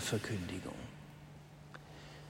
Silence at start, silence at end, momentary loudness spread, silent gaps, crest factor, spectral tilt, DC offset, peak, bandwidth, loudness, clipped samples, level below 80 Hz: 0 s; 0 s; 17 LU; none; 20 dB; -4.5 dB/octave; under 0.1%; -24 dBFS; 16 kHz; -44 LUFS; under 0.1%; -64 dBFS